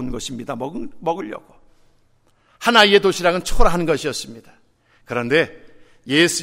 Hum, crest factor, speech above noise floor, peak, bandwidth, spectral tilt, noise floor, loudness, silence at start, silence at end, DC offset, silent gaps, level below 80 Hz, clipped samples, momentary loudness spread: none; 20 dB; 40 dB; 0 dBFS; 16 kHz; -3.5 dB/octave; -58 dBFS; -19 LUFS; 0 s; 0 s; under 0.1%; none; -30 dBFS; under 0.1%; 16 LU